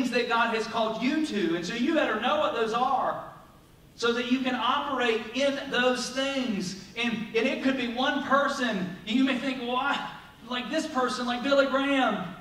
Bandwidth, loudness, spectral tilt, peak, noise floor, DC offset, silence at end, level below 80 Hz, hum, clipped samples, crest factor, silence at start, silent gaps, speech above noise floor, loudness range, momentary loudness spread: 15 kHz; -27 LUFS; -4 dB/octave; -10 dBFS; -54 dBFS; under 0.1%; 0 s; -62 dBFS; none; under 0.1%; 18 dB; 0 s; none; 27 dB; 1 LU; 6 LU